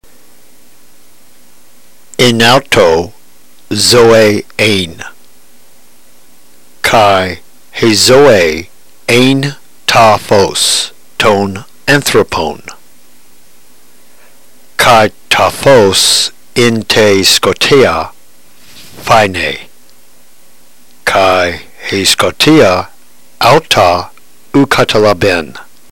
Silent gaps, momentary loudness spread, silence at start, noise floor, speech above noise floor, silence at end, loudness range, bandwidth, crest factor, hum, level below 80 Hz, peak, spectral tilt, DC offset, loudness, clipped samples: none; 14 LU; 0 s; -45 dBFS; 37 dB; 0.3 s; 6 LU; 16 kHz; 10 dB; none; -38 dBFS; 0 dBFS; -3.5 dB/octave; 3%; -8 LUFS; 0.4%